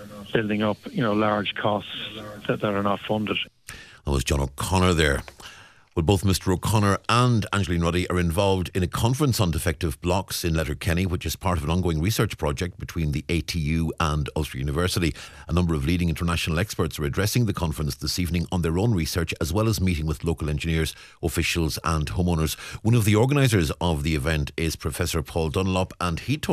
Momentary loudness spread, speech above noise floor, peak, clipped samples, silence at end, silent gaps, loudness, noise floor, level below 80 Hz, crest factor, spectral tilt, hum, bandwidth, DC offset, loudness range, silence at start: 7 LU; 23 dB; -6 dBFS; under 0.1%; 0 s; none; -24 LUFS; -47 dBFS; -36 dBFS; 18 dB; -5.5 dB/octave; none; 15 kHz; under 0.1%; 3 LU; 0 s